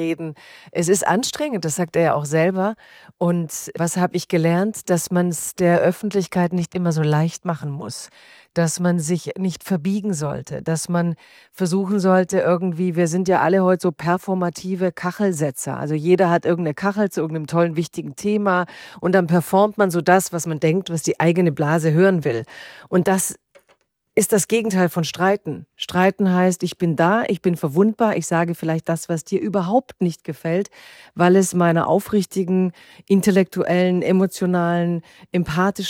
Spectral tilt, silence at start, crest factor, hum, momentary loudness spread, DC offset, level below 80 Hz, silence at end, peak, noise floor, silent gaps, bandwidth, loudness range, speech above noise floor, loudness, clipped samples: -6 dB/octave; 0 s; 18 dB; none; 9 LU; under 0.1%; -60 dBFS; 0 s; -2 dBFS; -62 dBFS; none; 16.5 kHz; 3 LU; 42 dB; -20 LUFS; under 0.1%